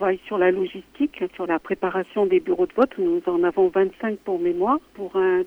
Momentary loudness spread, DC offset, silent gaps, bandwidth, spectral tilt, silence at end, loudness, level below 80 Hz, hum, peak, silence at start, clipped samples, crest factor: 7 LU; under 0.1%; none; 4.5 kHz; -8 dB/octave; 0 s; -23 LUFS; -58 dBFS; none; -6 dBFS; 0 s; under 0.1%; 16 dB